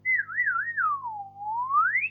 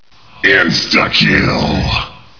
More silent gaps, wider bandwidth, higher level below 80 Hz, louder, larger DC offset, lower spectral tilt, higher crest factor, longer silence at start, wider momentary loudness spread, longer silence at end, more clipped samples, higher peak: neither; second, 2.9 kHz vs 5.4 kHz; second, -80 dBFS vs -30 dBFS; second, -26 LUFS vs -11 LUFS; second, under 0.1% vs 0.8%; first, -6 dB/octave vs -4.5 dB/octave; about the same, 12 dB vs 14 dB; second, 0.05 s vs 0.45 s; first, 12 LU vs 6 LU; second, 0 s vs 0.25 s; neither; second, -14 dBFS vs 0 dBFS